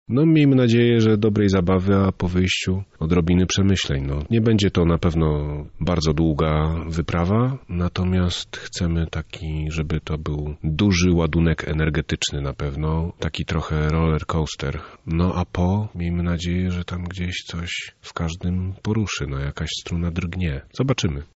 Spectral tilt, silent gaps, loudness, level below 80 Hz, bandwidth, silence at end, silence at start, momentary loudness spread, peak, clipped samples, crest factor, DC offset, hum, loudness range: -6 dB/octave; none; -22 LUFS; -34 dBFS; 8 kHz; 0.1 s; 0.1 s; 10 LU; -8 dBFS; under 0.1%; 12 dB; under 0.1%; none; 6 LU